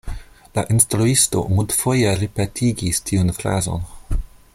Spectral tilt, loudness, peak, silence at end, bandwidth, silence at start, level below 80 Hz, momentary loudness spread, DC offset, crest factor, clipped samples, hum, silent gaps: -4.5 dB/octave; -19 LUFS; 0 dBFS; 0.3 s; 16.5 kHz; 0.05 s; -32 dBFS; 14 LU; under 0.1%; 20 dB; under 0.1%; none; none